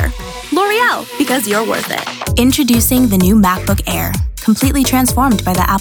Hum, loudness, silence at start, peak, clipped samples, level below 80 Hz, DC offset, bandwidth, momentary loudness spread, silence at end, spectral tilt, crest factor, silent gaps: none; -13 LUFS; 0 s; -2 dBFS; under 0.1%; -24 dBFS; under 0.1%; over 20 kHz; 8 LU; 0 s; -4.5 dB/octave; 12 dB; none